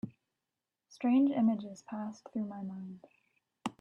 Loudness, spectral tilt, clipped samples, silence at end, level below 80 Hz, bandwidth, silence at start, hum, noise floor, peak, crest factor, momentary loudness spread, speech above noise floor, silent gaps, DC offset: -34 LUFS; -7 dB/octave; under 0.1%; 0.1 s; -80 dBFS; 9.8 kHz; 0.05 s; none; -90 dBFS; -20 dBFS; 16 dB; 19 LU; 57 dB; none; under 0.1%